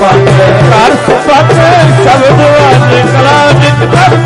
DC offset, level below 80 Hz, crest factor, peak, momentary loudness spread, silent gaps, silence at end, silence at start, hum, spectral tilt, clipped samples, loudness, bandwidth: 0.7%; -30 dBFS; 4 dB; 0 dBFS; 2 LU; none; 0 s; 0 s; none; -6 dB/octave; 2%; -4 LUFS; 11.5 kHz